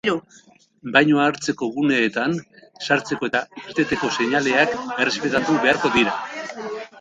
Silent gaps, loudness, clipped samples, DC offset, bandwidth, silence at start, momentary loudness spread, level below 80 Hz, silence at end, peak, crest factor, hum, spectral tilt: none; -20 LUFS; under 0.1%; under 0.1%; 9.2 kHz; 0.05 s; 13 LU; -58 dBFS; 0 s; 0 dBFS; 20 dB; none; -4.5 dB/octave